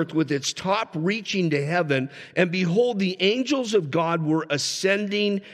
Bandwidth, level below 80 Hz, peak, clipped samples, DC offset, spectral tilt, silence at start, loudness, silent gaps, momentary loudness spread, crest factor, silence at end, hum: 14 kHz; -72 dBFS; -6 dBFS; under 0.1%; under 0.1%; -5 dB/octave; 0 s; -23 LUFS; none; 3 LU; 18 dB; 0 s; none